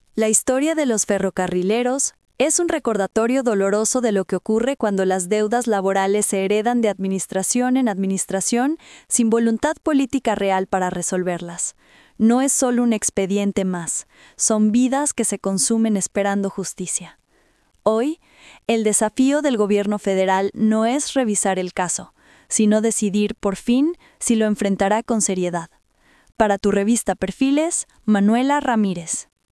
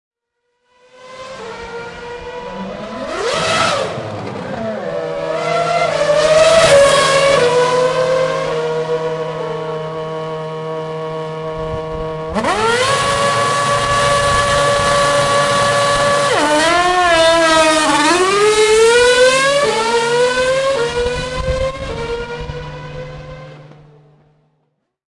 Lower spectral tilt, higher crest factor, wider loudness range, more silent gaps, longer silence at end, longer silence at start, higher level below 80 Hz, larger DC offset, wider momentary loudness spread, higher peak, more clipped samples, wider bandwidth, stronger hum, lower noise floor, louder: about the same, -4 dB/octave vs -3 dB/octave; about the same, 18 dB vs 14 dB; second, 2 LU vs 12 LU; neither; second, 0.3 s vs 1.45 s; second, 0.15 s vs 1 s; second, -54 dBFS vs -38 dBFS; neither; second, 7 LU vs 17 LU; about the same, -2 dBFS vs 0 dBFS; neither; about the same, 12 kHz vs 11.5 kHz; neither; second, -60 dBFS vs -70 dBFS; second, -20 LUFS vs -14 LUFS